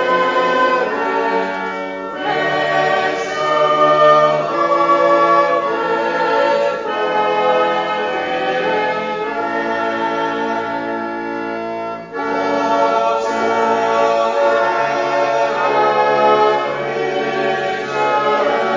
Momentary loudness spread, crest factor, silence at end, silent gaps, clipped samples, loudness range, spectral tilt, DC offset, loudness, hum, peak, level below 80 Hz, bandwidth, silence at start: 9 LU; 16 dB; 0 s; none; under 0.1%; 6 LU; -4.5 dB/octave; under 0.1%; -16 LUFS; none; 0 dBFS; -58 dBFS; 7.6 kHz; 0 s